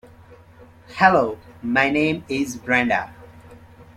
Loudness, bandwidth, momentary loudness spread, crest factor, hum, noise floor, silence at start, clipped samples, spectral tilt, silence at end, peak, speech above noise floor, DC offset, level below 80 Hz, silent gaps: -20 LUFS; 15 kHz; 14 LU; 20 dB; none; -47 dBFS; 0.3 s; under 0.1%; -5 dB/octave; 0.15 s; -2 dBFS; 28 dB; under 0.1%; -54 dBFS; none